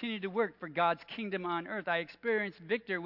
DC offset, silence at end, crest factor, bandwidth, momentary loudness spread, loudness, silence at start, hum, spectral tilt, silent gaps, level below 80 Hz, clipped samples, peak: under 0.1%; 0 s; 18 dB; 5.8 kHz; 5 LU; -34 LUFS; 0 s; none; -7.5 dB/octave; none; -78 dBFS; under 0.1%; -16 dBFS